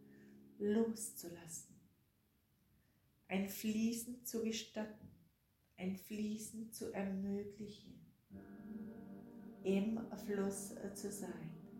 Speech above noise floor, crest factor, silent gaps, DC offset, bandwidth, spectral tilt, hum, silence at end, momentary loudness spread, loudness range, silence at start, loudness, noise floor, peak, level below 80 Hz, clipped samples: 35 dB; 18 dB; none; under 0.1%; 16.5 kHz; -5 dB/octave; none; 0 s; 20 LU; 3 LU; 0 s; -43 LUFS; -77 dBFS; -26 dBFS; -76 dBFS; under 0.1%